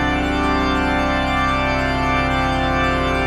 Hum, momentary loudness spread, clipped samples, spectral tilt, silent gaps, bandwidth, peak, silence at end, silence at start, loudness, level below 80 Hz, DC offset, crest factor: 50 Hz at -70 dBFS; 1 LU; under 0.1%; -5.5 dB/octave; none; 12.5 kHz; -6 dBFS; 0 s; 0 s; -18 LUFS; -26 dBFS; under 0.1%; 12 dB